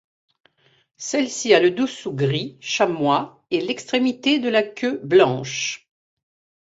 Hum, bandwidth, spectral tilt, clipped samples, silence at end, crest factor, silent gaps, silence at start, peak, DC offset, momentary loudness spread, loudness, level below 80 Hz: none; 8 kHz; -4.5 dB/octave; under 0.1%; 0.95 s; 20 dB; none; 1 s; -2 dBFS; under 0.1%; 10 LU; -21 LUFS; -66 dBFS